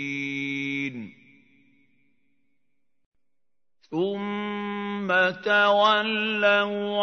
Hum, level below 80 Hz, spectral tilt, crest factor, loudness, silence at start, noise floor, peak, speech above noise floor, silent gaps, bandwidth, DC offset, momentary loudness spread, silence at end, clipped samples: none; -80 dBFS; -5 dB/octave; 20 dB; -24 LUFS; 0 s; -87 dBFS; -8 dBFS; 65 dB; 3.06-3.12 s; 6.6 kHz; under 0.1%; 11 LU; 0 s; under 0.1%